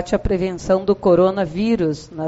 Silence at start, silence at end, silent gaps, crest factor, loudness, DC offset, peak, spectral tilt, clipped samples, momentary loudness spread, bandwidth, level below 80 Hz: 0 s; 0 s; none; 14 dB; -18 LUFS; under 0.1%; -4 dBFS; -6.5 dB/octave; under 0.1%; 7 LU; 8 kHz; -36 dBFS